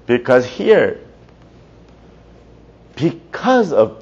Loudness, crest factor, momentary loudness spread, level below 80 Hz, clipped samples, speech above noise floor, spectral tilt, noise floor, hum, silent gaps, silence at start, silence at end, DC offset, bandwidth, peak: -15 LUFS; 16 dB; 8 LU; -50 dBFS; under 0.1%; 30 dB; -6.5 dB/octave; -44 dBFS; none; none; 0.1 s; 0.05 s; under 0.1%; 7.6 kHz; 0 dBFS